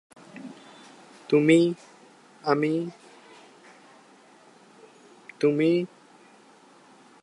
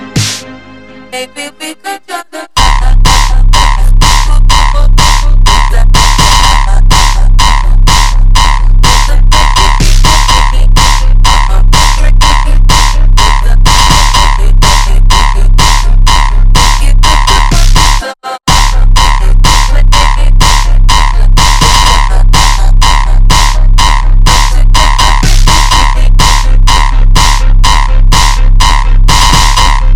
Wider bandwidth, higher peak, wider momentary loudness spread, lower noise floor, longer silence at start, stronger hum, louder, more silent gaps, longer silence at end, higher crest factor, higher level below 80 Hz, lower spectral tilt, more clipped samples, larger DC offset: second, 11 kHz vs 14 kHz; second, -8 dBFS vs 0 dBFS; first, 27 LU vs 3 LU; first, -54 dBFS vs -30 dBFS; first, 0.35 s vs 0 s; neither; second, -24 LUFS vs -8 LUFS; neither; first, 1.35 s vs 0 s; first, 22 dB vs 4 dB; second, -82 dBFS vs -4 dBFS; first, -6.5 dB/octave vs -3 dB/octave; second, under 0.1% vs 2%; second, under 0.1% vs 3%